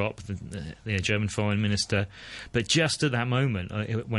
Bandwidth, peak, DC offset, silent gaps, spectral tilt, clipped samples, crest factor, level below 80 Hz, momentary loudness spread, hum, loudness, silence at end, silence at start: 11.5 kHz; -10 dBFS; under 0.1%; none; -4.5 dB/octave; under 0.1%; 18 dB; -50 dBFS; 13 LU; none; -27 LUFS; 0 s; 0 s